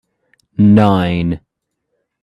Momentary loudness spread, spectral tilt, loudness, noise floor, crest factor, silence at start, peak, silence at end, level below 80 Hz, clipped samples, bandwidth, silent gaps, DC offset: 17 LU; -9 dB/octave; -13 LUFS; -73 dBFS; 16 dB; 0.6 s; 0 dBFS; 0.85 s; -44 dBFS; under 0.1%; 5.2 kHz; none; under 0.1%